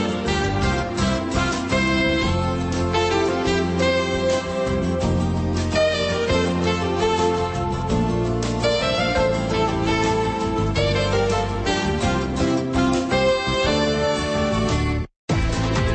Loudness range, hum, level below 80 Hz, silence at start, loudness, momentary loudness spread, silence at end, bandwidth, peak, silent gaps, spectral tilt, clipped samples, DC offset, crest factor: 1 LU; none; -32 dBFS; 0 s; -21 LUFS; 3 LU; 0 s; 8.8 kHz; -8 dBFS; 15.16-15.28 s; -5.5 dB/octave; under 0.1%; under 0.1%; 14 dB